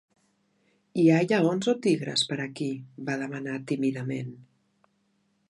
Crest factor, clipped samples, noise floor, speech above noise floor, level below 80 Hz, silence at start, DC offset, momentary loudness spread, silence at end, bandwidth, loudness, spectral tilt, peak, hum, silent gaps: 20 dB; under 0.1%; -71 dBFS; 45 dB; -74 dBFS; 0.95 s; under 0.1%; 13 LU; 1.05 s; 11.5 kHz; -27 LUFS; -5.5 dB/octave; -8 dBFS; none; none